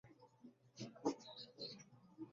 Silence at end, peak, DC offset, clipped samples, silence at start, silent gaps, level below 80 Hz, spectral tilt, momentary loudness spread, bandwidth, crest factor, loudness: 0 s; -26 dBFS; under 0.1%; under 0.1%; 0.05 s; none; -88 dBFS; -4.5 dB/octave; 20 LU; 7.4 kHz; 26 dB; -50 LUFS